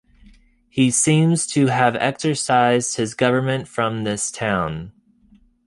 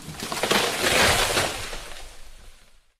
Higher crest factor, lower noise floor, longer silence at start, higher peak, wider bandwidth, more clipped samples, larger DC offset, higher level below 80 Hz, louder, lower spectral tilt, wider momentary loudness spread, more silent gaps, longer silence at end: about the same, 18 dB vs 16 dB; about the same, -54 dBFS vs -51 dBFS; first, 0.75 s vs 0 s; first, -2 dBFS vs -8 dBFS; second, 11.5 kHz vs 16.5 kHz; neither; neither; second, -52 dBFS vs -42 dBFS; about the same, -19 LUFS vs -21 LUFS; first, -4.5 dB/octave vs -2 dB/octave; second, 8 LU vs 19 LU; neither; first, 0.75 s vs 0.45 s